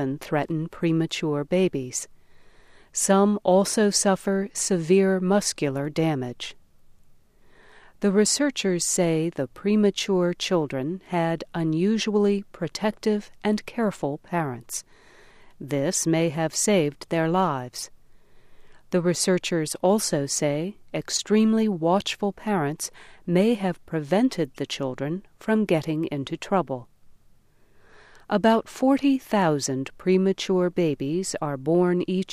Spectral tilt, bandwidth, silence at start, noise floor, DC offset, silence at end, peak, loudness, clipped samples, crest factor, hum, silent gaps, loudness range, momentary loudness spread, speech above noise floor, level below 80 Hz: -4.5 dB/octave; 15.5 kHz; 0 s; -56 dBFS; under 0.1%; 0 s; -8 dBFS; -24 LUFS; under 0.1%; 18 dB; none; none; 5 LU; 10 LU; 32 dB; -58 dBFS